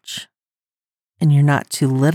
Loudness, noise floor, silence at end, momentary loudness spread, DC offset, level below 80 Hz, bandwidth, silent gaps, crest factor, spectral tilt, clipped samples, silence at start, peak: -17 LUFS; under -90 dBFS; 0 s; 16 LU; under 0.1%; -76 dBFS; 14.5 kHz; none; 16 dB; -6 dB/octave; under 0.1%; 0.05 s; -4 dBFS